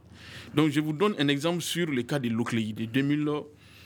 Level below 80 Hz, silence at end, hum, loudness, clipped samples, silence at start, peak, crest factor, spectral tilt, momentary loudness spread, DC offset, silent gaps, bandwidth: -66 dBFS; 0 s; none; -28 LUFS; under 0.1%; 0.1 s; -10 dBFS; 18 dB; -5.5 dB/octave; 8 LU; under 0.1%; none; 19.5 kHz